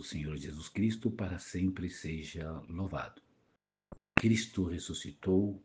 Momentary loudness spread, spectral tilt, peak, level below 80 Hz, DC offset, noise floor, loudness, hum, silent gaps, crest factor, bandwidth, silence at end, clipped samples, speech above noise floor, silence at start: 11 LU; -5.5 dB/octave; -8 dBFS; -56 dBFS; under 0.1%; -77 dBFS; -35 LUFS; none; none; 28 dB; 9.8 kHz; 0 s; under 0.1%; 42 dB; 0 s